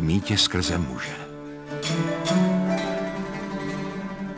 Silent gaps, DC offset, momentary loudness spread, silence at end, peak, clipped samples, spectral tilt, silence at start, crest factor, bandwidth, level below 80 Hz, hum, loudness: none; under 0.1%; 12 LU; 0 s; -6 dBFS; under 0.1%; -5 dB/octave; 0 s; 18 dB; 8 kHz; -44 dBFS; none; -25 LUFS